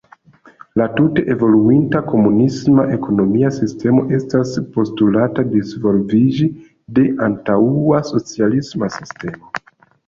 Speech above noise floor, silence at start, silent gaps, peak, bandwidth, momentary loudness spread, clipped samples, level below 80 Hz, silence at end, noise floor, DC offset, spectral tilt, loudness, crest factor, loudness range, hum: 31 dB; 0.75 s; none; -2 dBFS; 7.6 kHz; 10 LU; under 0.1%; -48 dBFS; 0.5 s; -46 dBFS; under 0.1%; -8 dB/octave; -16 LUFS; 14 dB; 3 LU; none